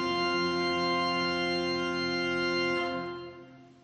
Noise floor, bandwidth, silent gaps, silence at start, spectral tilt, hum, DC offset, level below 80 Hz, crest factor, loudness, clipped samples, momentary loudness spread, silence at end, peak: -51 dBFS; 8.8 kHz; none; 0 s; -4.5 dB/octave; none; under 0.1%; -66 dBFS; 12 dB; -29 LUFS; under 0.1%; 8 LU; 0.15 s; -18 dBFS